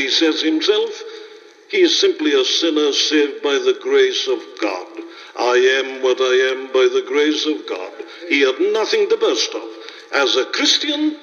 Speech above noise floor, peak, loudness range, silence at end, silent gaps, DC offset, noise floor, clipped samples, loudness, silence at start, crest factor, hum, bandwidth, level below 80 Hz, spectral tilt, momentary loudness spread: 24 dB; -2 dBFS; 2 LU; 0.05 s; none; under 0.1%; -41 dBFS; under 0.1%; -17 LUFS; 0 s; 16 dB; none; 7.2 kHz; -80 dBFS; 0 dB/octave; 14 LU